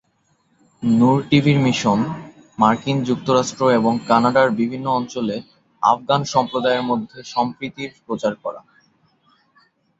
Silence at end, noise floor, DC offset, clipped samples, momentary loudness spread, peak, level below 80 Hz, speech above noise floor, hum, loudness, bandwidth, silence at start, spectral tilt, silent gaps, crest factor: 1.4 s; -64 dBFS; under 0.1%; under 0.1%; 13 LU; -2 dBFS; -56 dBFS; 46 dB; none; -19 LUFS; 7.8 kHz; 0.8 s; -6 dB/octave; none; 18 dB